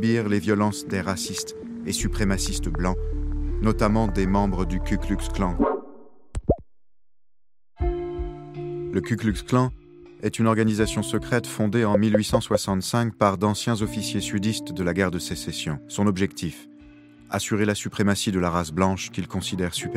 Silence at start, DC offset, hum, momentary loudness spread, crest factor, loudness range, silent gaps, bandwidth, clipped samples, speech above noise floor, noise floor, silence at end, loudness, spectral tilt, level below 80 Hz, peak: 0 s; under 0.1%; none; 9 LU; 22 dB; 6 LU; none; 15.5 kHz; under 0.1%; 29 dB; -53 dBFS; 0 s; -25 LUFS; -5.5 dB/octave; -34 dBFS; -2 dBFS